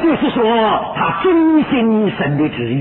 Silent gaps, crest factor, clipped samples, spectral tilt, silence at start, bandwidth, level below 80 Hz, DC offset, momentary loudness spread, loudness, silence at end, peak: none; 12 dB; under 0.1%; -10.5 dB/octave; 0 s; 4.2 kHz; -46 dBFS; under 0.1%; 5 LU; -15 LUFS; 0 s; -2 dBFS